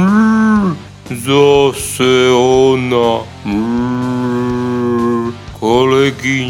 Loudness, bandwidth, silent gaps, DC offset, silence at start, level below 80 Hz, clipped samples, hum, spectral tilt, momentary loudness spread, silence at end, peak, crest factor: -13 LUFS; 16.5 kHz; none; under 0.1%; 0 s; -40 dBFS; under 0.1%; none; -5.5 dB/octave; 10 LU; 0 s; 0 dBFS; 12 dB